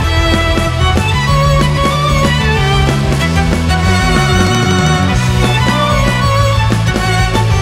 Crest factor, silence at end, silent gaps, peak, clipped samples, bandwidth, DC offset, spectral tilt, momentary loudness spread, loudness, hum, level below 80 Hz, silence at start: 10 dB; 0 s; none; -2 dBFS; under 0.1%; 16.5 kHz; under 0.1%; -5 dB/octave; 2 LU; -11 LUFS; none; -18 dBFS; 0 s